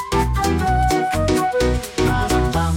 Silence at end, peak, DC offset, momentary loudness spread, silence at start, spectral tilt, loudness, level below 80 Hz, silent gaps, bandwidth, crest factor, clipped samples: 0 s; -6 dBFS; under 0.1%; 2 LU; 0 s; -5.5 dB/octave; -19 LUFS; -26 dBFS; none; 17 kHz; 12 dB; under 0.1%